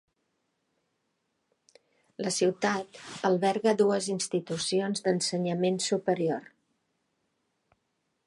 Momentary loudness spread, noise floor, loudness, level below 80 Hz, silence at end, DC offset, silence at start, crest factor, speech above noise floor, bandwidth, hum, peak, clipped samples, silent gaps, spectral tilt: 6 LU; -78 dBFS; -28 LUFS; -78 dBFS; 1.85 s; under 0.1%; 2.2 s; 20 dB; 50 dB; 11.5 kHz; none; -12 dBFS; under 0.1%; none; -4.5 dB/octave